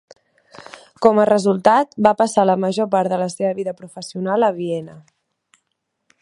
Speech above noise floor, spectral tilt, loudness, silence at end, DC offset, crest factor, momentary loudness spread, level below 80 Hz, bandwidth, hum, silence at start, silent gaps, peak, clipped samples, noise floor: 57 dB; -6 dB/octave; -18 LUFS; 1.2 s; under 0.1%; 18 dB; 13 LU; -62 dBFS; 11.5 kHz; none; 1 s; none; 0 dBFS; under 0.1%; -75 dBFS